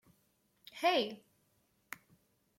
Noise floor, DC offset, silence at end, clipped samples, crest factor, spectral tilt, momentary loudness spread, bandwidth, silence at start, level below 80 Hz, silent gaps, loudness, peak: -75 dBFS; under 0.1%; 1.4 s; under 0.1%; 20 dB; -3 dB/octave; 22 LU; 16.5 kHz; 0.75 s; -86 dBFS; none; -34 LUFS; -20 dBFS